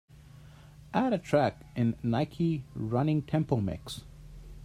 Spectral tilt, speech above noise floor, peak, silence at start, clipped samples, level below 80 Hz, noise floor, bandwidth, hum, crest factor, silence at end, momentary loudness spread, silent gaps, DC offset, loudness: -7.5 dB/octave; 23 dB; -10 dBFS; 0.35 s; under 0.1%; -54 dBFS; -52 dBFS; 14 kHz; none; 20 dB; 0 s; 15 LU; none; under 0.1%; -30 LUFS